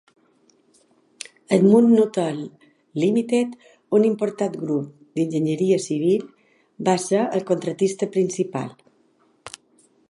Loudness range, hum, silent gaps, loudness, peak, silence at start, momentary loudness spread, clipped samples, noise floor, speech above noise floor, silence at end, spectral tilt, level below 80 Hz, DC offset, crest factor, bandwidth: 4 LU; none; none; -21 LUFS; -4 dBFS; 1.5 s; 18 LU; under 0.1%; -61 dBFS; 41 dB; 0.6 s; -6.5 dB/octave; -72 dBFS; under 0.1%; 20 dB; 11.5 kHz